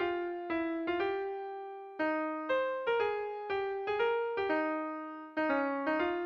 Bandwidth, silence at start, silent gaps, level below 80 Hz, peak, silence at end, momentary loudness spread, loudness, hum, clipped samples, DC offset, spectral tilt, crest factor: 6.6 kHz; 0 s; none; -70 dBFS; -20 dBFS; 0 s; 8 LU; -34 LUFS; none; under 0.1%; under 0.1%; -6 dB/octave; 14 dB